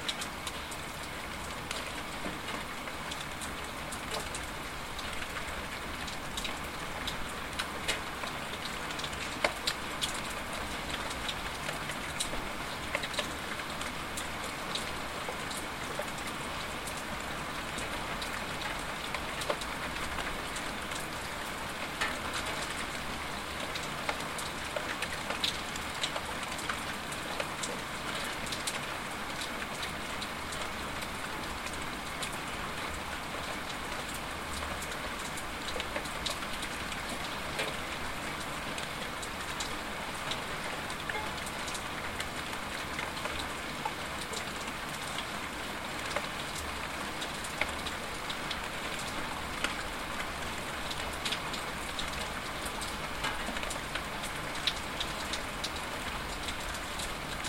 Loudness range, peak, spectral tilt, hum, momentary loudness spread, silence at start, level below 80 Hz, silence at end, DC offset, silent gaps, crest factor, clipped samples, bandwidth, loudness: 2 LU; -10 dBFS; -2.5 dB/octave; none; 3 LU; 0 s; -50 dBFS; 0 s; 0.2%; none; 26 dB; under 0.1%; 16.5 kHz; -36 LUFS